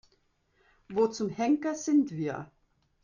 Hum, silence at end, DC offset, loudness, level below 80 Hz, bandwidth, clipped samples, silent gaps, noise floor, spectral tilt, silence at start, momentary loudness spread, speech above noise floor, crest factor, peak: none; 0.6 s; under 0.1%; -29 LUFS; -70 dBFS; 7.4 kHz; under 0.1%; none; -71 dBFS; -6 dB/octave; 0.9 s; 10 LU; 43 dB; 16 dB; -16 dBFS